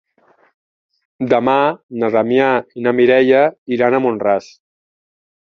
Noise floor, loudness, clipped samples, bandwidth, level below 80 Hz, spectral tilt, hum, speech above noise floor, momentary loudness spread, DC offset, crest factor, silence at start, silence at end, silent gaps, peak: -55 dBFS; -15 LUFS; under 0.1%; 6.6 kHz; -60 dBFS; -7 dB/octave; none; 41 dB; 7 LU; under 0.1%; 16 dB; 1.2 s; 1 s; 1.83-1.89 s, 3.58-3.66 s; -2 dBFS